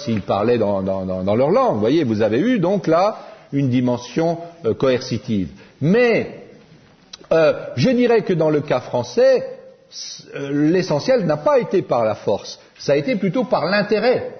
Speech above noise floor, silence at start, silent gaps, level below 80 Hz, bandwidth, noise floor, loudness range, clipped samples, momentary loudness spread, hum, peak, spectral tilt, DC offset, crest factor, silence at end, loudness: 31 dB; 0 s; none; -56 dBFS; 6.6 kHz; -49 dBFS; 2 LU; under 0.1%; 9 LU; none; -4 dBFS; -6.5 dB/octave; under 0.1%; 14 dB; 0 s; -18 LUFS